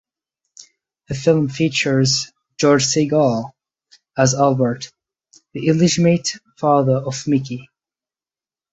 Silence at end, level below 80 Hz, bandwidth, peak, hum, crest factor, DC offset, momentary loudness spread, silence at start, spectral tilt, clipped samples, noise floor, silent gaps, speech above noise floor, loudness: 1.1 s; -54 dBFS; 8.2 kHz; -2 dBFS; none; 18 dB; under 0.1%; 15 LU; 1.1 s; -5 dB/octave; under 0.1%; under -90 dBFS; none; over 73 dB; -17 LUFS